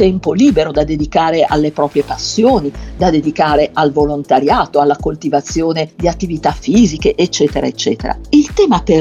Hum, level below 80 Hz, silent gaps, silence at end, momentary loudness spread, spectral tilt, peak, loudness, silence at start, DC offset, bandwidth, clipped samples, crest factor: none; -30 dBFS; none; 0 s; 6 LU; -5.5 dB/octave; 0 dBFS; -13 LUFS; 0 s; under 0.1%; 8.8 kHz; under 0.1%; 12 dB